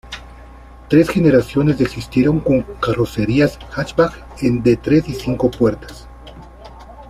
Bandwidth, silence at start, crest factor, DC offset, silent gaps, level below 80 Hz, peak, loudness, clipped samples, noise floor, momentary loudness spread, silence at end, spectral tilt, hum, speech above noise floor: 15 kHz; 0.05 s; 16 dB; under 0.1%; none; -38 dBFS; -2 dBFS; -17 LUFS; under 0.1%; -39 dBFS; 10 LU; 0 s; -7.5 dB/octave; none; 23 dB